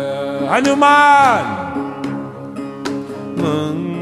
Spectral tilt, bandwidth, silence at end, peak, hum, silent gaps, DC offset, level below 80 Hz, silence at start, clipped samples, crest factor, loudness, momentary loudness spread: -5 dB/octave; 13 kHz; 0 s; 0 dBFS; none; none; under 0.1%; -56 dBFS; 0 s; under 0.1%; 16 dB; -15 LUFS; 17 LU